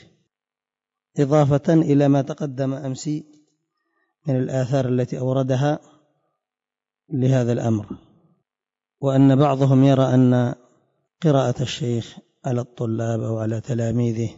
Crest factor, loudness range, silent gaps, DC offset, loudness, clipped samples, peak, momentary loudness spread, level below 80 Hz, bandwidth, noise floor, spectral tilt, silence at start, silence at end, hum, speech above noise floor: 14 dB; 6 LU; none; under 0.1%; -20 LUFS; under 0.1%; -8 dBFS; 13 LU; -58 dBFS; 7.8 kHz; -90 dBFS; -8 dB/octave; 1.15 s; 0.05 s; none; 71 dB